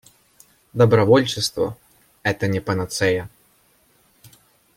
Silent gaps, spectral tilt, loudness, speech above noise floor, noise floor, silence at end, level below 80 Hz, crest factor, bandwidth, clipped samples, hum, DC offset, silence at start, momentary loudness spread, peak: none; -5.5 dB/octave; -20 LUFS; 41 dB; -59 dBFS; 1.5 s; -56 dBFS; 20 dB; 16.5 kHz; under 0.1%; none; under 0.1%; 0.75 s; 11 LU; -2 dBFS